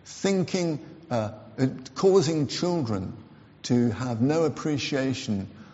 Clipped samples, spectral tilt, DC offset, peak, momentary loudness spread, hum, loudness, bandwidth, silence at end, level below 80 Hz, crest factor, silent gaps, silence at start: under 0.1%; -6 dB/octave; under 0.1%; -10 dBFS; 10 LU; none; -26 LUFS; 8 kHz; 0 s; -62 dBFS; 16 dB; none; 0.05 s